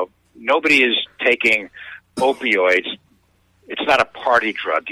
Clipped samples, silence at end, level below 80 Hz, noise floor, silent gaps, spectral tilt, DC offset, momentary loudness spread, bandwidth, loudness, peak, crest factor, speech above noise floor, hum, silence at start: under 0.1%; 0 s; -58 dBFS; -59 dBFS; none; -3 dB/octave; under 0.1%; 17 LU; 15.5 kHz; -17 LUFS; 0 dBFS; 18 dB; 41 dB; none; 0 s